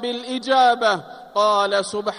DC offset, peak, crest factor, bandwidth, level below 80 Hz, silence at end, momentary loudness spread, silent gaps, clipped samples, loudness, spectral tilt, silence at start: under 0.1%; -6 dBFS; 14 dB; 11.5 kHz; -68 dBFS; 0 s; 10 LU; none; under 0.1%; -19 LUFS; -3 dB/octave; 0 s